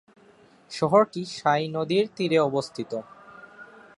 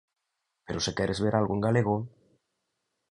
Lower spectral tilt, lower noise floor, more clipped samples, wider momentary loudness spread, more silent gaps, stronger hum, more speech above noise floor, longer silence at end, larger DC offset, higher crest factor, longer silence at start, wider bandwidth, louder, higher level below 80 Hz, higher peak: about the same, -5.5 dB/octave vs -5.5 dB/octave; second, -56 dBFS vs -82 dBFS; neither; first, 16 LU vs 9 LU; neither; neither; second, 31 dB vs 55 dB; second, 0.3 s vs 1.05 s; neither; about the same, 20 dB vs 20 dB; about the same, 0.7 s vs 0.7 s; about the same, 11.5 kHz vs 10.5 kHz; first, -25 LUFS vs -28 LUFS; second, -68 dBFS vs -54 dBFS; first, -6 dBFS vs -10 dBFS